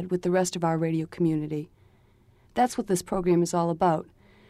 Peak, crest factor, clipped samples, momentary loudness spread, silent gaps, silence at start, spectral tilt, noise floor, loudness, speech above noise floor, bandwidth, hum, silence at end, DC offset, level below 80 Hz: -12 dBFS; 14 dB; under 0.1%; 9 LU; none; 0 s; -6 dB/octave; -59 dBFS; -26 LUFS; 34 dB; 14.5 kHz; none; 0.45 s; under 0.1%; -56 dBFS